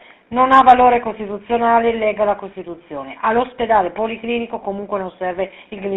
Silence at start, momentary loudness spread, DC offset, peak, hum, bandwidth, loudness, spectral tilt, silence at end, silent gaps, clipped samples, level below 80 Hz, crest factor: 0.3 s; 18 LU; under 0.1%; 0 dBFS; none; 6.6 kHz; -17 LUFS; -3 dB/octave; 0 s; none; under 0.1%; -48 dBFS; 18 dB